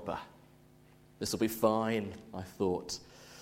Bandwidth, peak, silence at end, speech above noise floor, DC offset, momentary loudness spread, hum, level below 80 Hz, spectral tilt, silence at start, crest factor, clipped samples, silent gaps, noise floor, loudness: 16.5 kHz; -14 dBFS; 0 s; 27 dB; under 0.1%; 16 LU; 50 Hz at -60 dBFS; -64 dBFS; -5 dB/octave; 0 s; 22 dB; under 0.1%; none; -60 dBFS; -35 LUFS